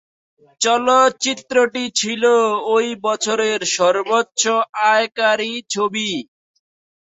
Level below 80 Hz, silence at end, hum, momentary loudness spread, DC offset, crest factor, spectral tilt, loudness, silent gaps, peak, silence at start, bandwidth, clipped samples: -66 dBFS; 0.8 s; none; 7 LU; under 0.1%; 16 dB; -1.5 dB/octave; -17 LUFS; 4.69-4.73 s; -2 dBFS; 0.6 s; 8.4 kHz; under 0.1%